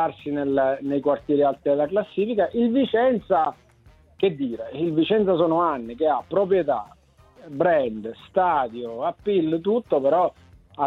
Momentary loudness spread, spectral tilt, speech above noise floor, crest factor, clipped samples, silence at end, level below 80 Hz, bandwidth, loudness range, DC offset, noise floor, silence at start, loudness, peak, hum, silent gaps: 7 LU; -8.5 dB/octave; 32 dB; 16 dB; under 0.1%; 0 s; -58 dBFS; 5 kHz; 2 LU; under 0.1%; -54 dBFS; 0 s; -23 LUFS; -8 dBFS; none; none